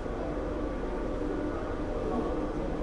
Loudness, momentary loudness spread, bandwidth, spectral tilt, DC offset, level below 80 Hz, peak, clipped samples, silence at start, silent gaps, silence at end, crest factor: -34 LUFS; 3 LU; 10.5 kHz; -7.5 dB/octave; under 0.1%; -38 dBFS; -20 dBFS; under 0.1%; 0 s; none; 0 s; 12 dB